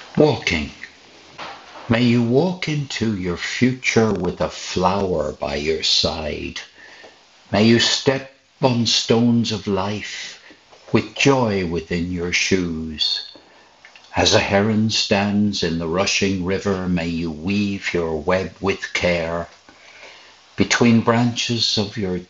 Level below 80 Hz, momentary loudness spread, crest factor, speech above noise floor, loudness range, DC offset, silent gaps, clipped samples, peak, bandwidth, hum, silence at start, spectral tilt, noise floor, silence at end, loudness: -48 dBFS; 11 LU; 18 dB; 29 dB; 3 LU; under 0.1%; none; under 0.1%; -2 dBFS; 8 kHz; none; 0 s; -4.5 dB/octave; -48 dBFS; 0.05 s; -19 LUFS